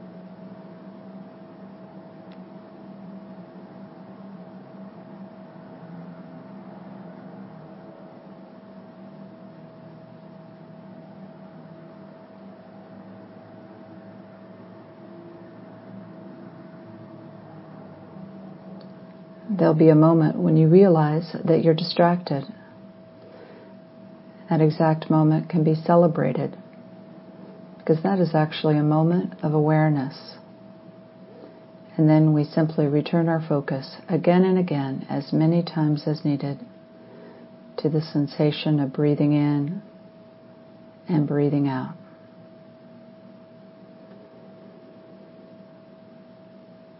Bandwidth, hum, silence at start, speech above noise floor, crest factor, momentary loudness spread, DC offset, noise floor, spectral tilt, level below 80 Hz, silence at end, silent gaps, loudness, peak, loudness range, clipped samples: 5.8 kHz; none; 0 s; 28 dB; 22 dB; 26 LU; under 0.1%; -48 dBFS; -12.5 dB/octave; -72 dBFS; 5 s; none; -21 LUFS; -2 dBFS; 24 LU; under 0.1%